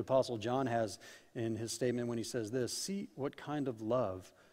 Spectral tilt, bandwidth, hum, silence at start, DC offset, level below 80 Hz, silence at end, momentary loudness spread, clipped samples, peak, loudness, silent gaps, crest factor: -5 dB/octave; 16 kHz; none; 0 s; under 0.1%; -72 dBFS; 0.25 s; 8 LU; under 0.1%; -18 dBFS; -37 LUFS; none; 18 dB